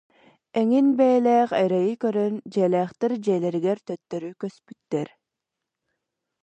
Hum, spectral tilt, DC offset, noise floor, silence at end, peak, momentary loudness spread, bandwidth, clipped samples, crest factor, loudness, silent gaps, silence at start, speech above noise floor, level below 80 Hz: none; -7.5 dB/octave; under 0.1%; -85 dBFS; 1.35 s; -8 dBFS; 14 LU; 8.8 kHz; under 0.1%; 16 dB; -23 LUFS; none; 0.55 s; 62 dB; -76 dBFS